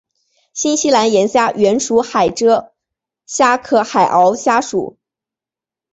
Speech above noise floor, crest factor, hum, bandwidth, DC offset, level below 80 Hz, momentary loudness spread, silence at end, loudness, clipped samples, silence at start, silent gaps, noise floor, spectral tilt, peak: 75 dB; 14 dB; none; 8.4 kHz; under 0.1%; -56 dBFS; 9 LU; 1.05 s; -14 LUFS; under 0.1%; 0.55 s; none; -88 dBFS; -3.5 dB/octave; 0 dBFS